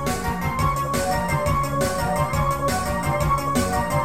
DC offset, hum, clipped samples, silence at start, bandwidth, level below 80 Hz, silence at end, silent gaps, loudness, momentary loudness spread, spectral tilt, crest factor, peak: 1%; none; under 0.1%; 0 s; 17 kHz; -34 dBFS; 0 s; none; -23 LUFS; 2 LU; -5 dB/octave; 14 dB; -8 dBFS